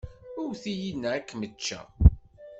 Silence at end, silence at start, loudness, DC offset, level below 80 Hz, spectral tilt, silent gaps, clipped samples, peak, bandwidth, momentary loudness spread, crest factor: 0 s; 0.05 s; -28 LUFS; under 0.1%; -32 dBFS; -6 dB/octave; none; under 0.1%; -4 dBFS; 8 kHz; 15 LU; 22 dB